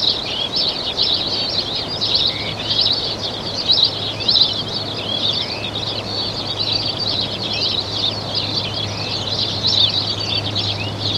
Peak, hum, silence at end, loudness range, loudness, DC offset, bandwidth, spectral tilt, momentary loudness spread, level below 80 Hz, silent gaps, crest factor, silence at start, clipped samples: -2 dBFS; none; 0 s; 3 LU; -17 LUFS; under 0.1%; 15 kHz; -3.5 dB/octave; 8 LU; -44 dBFS; none; 18 dB; 0 s; under 0.1%